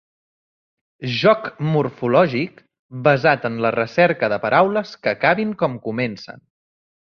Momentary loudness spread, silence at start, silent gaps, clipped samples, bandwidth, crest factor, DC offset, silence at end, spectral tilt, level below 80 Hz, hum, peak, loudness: 9 LU; 1 s; 2.79-2.89 s; under 0.1%; 6.8 kHz; 18 dB; under 0.1%; 0.7 s; -7 dB/octave; -60 dBFS; none; -2 dBFS; -19 LUFS